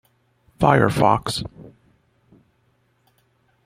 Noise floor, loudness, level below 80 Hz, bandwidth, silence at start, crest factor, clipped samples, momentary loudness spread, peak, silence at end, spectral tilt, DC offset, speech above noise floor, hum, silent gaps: -64 dBFS; -19 LUFS; -48 dBFS; 15.5 kHz; 0.6 s; 22 dB; under 0.1%; 12 LU; 0 dBFS; 1.95 s; -6 dB/octave; under 0.1%; 46 dB; none; none